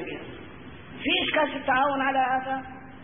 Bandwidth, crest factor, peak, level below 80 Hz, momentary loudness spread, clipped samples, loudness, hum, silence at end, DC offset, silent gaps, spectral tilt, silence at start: 3.7 kHz; 16 dB; -12 dBFS; -56 dBFS; 20 LU; under 0.1%; -25 LUFS; none; 0 s; 0.3%; none; -8 dB/octave; 0 s